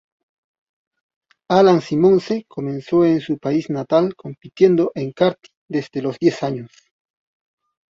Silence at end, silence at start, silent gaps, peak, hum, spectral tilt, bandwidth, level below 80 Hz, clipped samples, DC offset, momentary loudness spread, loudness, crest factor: 1.25 s; 1.5 s; 5.57-5.68 s; -2 dBFS; none; -7.5 dB/octave; 7.6 kHz; -60 dBFS; under 0.1%; under 0.1%; 12 LU; -18 LUFS; 18 dB